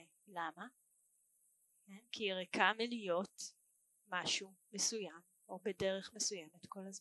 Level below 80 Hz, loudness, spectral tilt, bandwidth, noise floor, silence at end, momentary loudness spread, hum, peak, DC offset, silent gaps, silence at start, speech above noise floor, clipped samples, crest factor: -80 dBFS; -40 LUFS; -2 dB/octave; 12 kHz; -77 dBFS; 0 s; 19 LU; none; -16 dBFS; under 0.1%; none; 0 s; 35 dB; under 0.1%; 26 dB